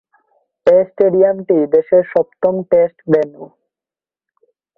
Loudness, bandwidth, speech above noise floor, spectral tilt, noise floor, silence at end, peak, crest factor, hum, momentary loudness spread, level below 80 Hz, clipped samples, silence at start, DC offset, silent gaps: -14 LUFS; 4.8 kHz; over 77 dB; -9.5 dB/octave; under -90 dBFS; 1.35 s; -2 dBFS; 14 dB; none; 6 LU; -60 dBFS; under 0.1%; 0.65 s; under 0.1%; none